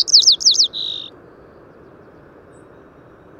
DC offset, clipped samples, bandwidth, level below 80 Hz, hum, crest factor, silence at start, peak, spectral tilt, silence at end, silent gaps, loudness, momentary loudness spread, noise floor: under 0.1%; under 0.1%; 17 kHz; -60 dBFS; none; 18 dB; 0 s; -2 dBFS; 1.5 dB/octave; 2.35 s; none; -12 LUFS; 20 LU; -45 dBFS